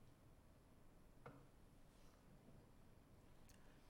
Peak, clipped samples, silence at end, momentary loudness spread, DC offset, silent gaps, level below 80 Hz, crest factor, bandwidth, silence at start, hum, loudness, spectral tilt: -46 dBFS; under 0.1%; 0 s; 5 LU; under 0.1%; none; -72 dBFS; 20 dB; 16 kHz; 0 s; none; -67 LUFS; -5.5 dB/octave